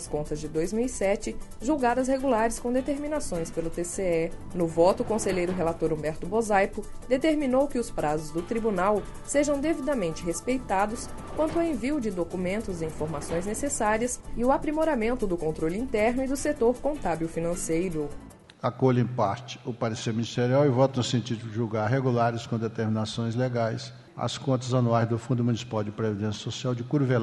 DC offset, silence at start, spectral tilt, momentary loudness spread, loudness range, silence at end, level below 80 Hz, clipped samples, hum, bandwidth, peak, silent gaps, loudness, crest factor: under 0.1%; 0 s; -6 dB/octave; 7 LU; 2 LU; 0 s; -42 dBFS; under 0.1%; none; 11.5 kHz; -8 dBFS; none; -27 LUFS; 18 dB